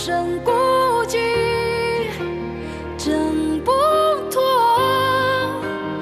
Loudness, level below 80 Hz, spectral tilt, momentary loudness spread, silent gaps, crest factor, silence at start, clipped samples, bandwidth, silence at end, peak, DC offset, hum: -19 LUFS; -42 dBFS; -4.5 dB/octave; 10 LU; none; 12 dB; 0 s; under 0.1%; 14 kHz; 0 s; -6 dBFS; under 0.1%; none